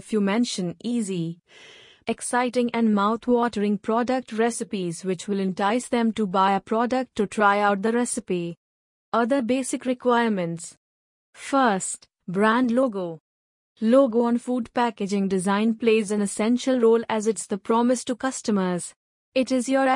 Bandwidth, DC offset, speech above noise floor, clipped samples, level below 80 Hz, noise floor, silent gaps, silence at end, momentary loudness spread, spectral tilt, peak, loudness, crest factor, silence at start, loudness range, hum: 11 kHz; under 0.1%; over 67 dB; under 0.1%; -66 dBFS; under -90 dBFS; 8.57-9.12 s, 10.77-11.33 s, 13.20-13.76 s, 18.96-19.32 s; 0 s; 9 LU; -5 dB/octave; -6 dBFS; -23 LUFS; 18 dB; 0.05 s; 3 LU; none